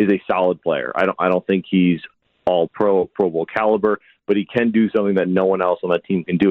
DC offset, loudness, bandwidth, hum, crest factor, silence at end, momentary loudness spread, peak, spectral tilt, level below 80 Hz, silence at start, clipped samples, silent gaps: under 0.1%; -19 LUFS; 4.9 kHz; none; 14 dB; 0 s; 4 LU; -4 dBFS; -9 dB/octave; -58 dBFS; 0 s; under 0.1%; none